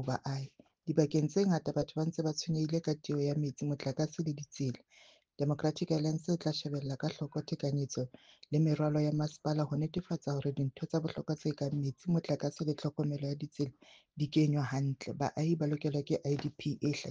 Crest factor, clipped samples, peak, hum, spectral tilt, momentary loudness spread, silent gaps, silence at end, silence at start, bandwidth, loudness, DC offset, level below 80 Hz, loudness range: 20 dB; under 0.1%; -14 dBFS; none; -7 dB/octave; 8 LU; none; 0 s; 0 s; 7.6 kHz; -35 LUFS; under 0.1%; -68 dBFS; 2 LU